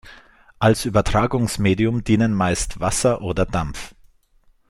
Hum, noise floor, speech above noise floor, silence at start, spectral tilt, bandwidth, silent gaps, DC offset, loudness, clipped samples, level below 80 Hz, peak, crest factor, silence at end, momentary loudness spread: none; -57 dBFS; 38 dB; 0.05 s; -5.5 dB/octave; 16 kHz; none; under 0.1%; -20 LUFS; under 0.1%; -36 dBFS; -2 dBFS; 18 dB; 0.8 s; 6 LU